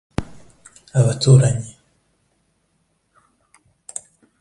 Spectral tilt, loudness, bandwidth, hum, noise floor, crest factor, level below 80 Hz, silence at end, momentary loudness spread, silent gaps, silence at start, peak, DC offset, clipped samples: -6 dB/octave; -17 LUFS; 11.5 kHz; none; -67 dBFS; 22 dB; -46 dBFS; 2.7 s; 20 LU; none; 0.2 s; 0 dBFS; under 0.1%; under 0.1%